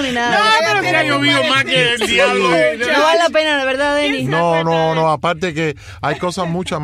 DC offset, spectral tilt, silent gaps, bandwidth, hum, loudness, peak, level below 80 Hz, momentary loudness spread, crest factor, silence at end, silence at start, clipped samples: under 0.1%; -4 dB/octave; none; 15.5 kHz; none; -14 LUFS; -2 dBFS; -48 dBFS; 8 LU; 14 dB; 0 s; 0 s; under 0.1%